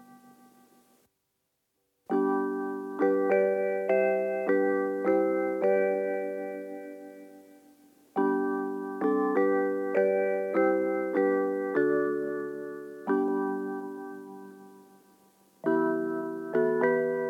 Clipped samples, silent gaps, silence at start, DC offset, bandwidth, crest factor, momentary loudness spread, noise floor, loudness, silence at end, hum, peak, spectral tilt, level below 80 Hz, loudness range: under 0.1%; none; 0 s; under 0.1%; 4.9 kHz; 16 dB; 13 LU; -79 dBFS; -28 LUFS; 0 s; none; -14 dBFS; -8.5 dB/octave; under -90 dBFS; 6 LU